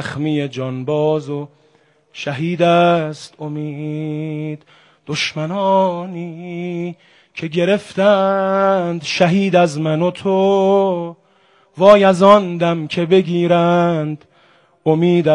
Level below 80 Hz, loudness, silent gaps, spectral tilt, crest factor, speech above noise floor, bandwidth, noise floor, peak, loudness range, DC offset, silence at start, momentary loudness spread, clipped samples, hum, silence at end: -60 dBFS; -16 LUFS; none; -6.5 dB/octave; 16 dB; 40 dB; 10.5 kHz; -55 dBFS; 0 dBFS; 7 LU; under 0.1%; 0 s; 16 LU; 0.1%; none; 0 s